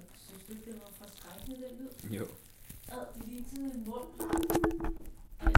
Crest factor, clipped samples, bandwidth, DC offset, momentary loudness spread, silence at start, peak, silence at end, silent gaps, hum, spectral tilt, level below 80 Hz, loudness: 30 dB; under 0.1%; 17 kHz; under 0.1%; 19 LU; 0 s; -6 dBFS; 0 s; none; none; -5.5 dB/octave; -42 dBFS; -39 LUFS